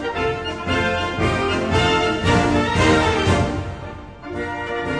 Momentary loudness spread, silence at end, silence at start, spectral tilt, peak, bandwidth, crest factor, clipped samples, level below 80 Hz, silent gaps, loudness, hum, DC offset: 13 LU; 0 s; 0 s; -5.5 dB/octave; -4 dBFS; 10.5 kHz; 16 dB; under 0.1%; -34 dBFS; none; -19 LUFS; none; 0.2%